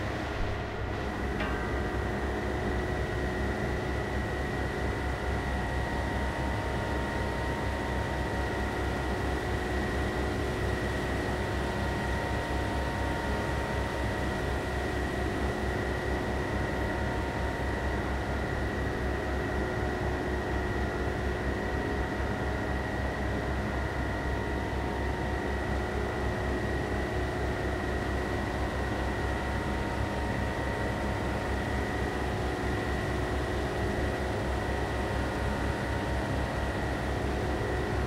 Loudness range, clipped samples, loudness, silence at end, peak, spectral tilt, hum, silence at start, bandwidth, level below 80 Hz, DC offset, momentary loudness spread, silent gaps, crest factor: 1 LU; under 0.1%; -32 LUFS; 0 s; -18 dBFS; -6 dB/octave; none; 0 s; 15.5 kHz; -36 dBFS; under 0.1%; 1 LU; none; 14 dB